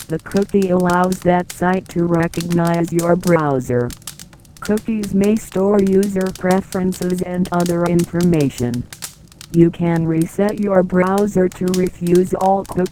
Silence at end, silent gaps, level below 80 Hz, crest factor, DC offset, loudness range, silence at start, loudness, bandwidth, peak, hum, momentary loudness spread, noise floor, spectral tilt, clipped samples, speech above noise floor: 0 s; none; -42 dBFS; 16 dB; 0.2%; 2 LU; 0 s; -17 LUFS; 17.5 kHz; 0 dBFS; none; 6 LU; -40 dBFS; -7 dB/octave; under 0.1%; 24 dB